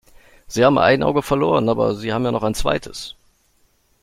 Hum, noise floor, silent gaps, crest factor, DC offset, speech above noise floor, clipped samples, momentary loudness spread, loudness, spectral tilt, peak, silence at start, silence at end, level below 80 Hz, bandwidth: none; -60 dBFS; none; 18 dB; under 0.1%; 43 dB; under 0.1%; 14 LU; -18 LUFS; -5.5 dB/octave; -2 dBFS; 0.5 s; 0.9 s; -40 dBFS; 16 kHz